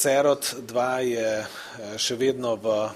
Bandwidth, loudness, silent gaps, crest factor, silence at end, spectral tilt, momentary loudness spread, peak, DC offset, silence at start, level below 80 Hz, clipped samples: 15.5 kHz; -25 LUFS; none; 16 dB; 0 s; -3 dB/octave; 11 LU; -8 dBFS; under 0.1%; 0 s; -66 dBFS; under 0.1%